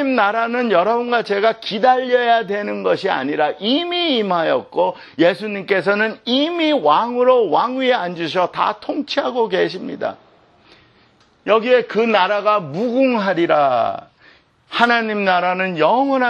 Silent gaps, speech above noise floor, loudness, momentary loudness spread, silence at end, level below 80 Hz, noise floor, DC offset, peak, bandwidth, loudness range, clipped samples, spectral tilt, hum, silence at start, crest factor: none; 37 dB; -17 LUFS; 6 LU; 0 s; -68 dBFS; -54 dBFS; under 0.1%; 0 dBFS; 8.2 kHz; 4 LU; under 0.1%; -6 dB/octave; none; 0 s; 18 dB